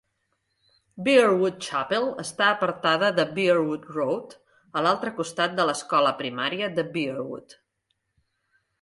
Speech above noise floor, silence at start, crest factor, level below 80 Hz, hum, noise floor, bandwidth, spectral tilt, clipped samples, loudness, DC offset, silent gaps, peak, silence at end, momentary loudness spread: 52 dB; 0.95 s; 18 dB; -72 dBFS; none; -76 dBFS; 11.5 kHz; -4 dB/octave; under 0.1%; -24 LUFS; under 0.1%; none; -6 dBFS; 1.4 s; 9 LU